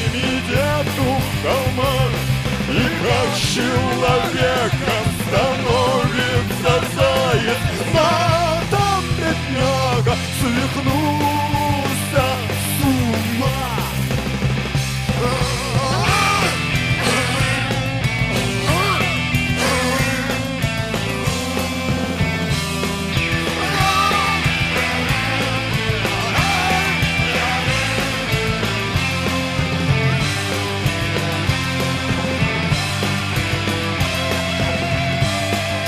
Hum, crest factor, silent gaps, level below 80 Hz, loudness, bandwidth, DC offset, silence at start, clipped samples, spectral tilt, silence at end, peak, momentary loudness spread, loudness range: none; 16 dB; none; -34 dBFS; -18 LUFS; 15.5 kHz; under 0.1%; 0 s; under 0.1%; -4.5 dB/octave; 0 s; -2 dBFS; 4 LU; 2 LU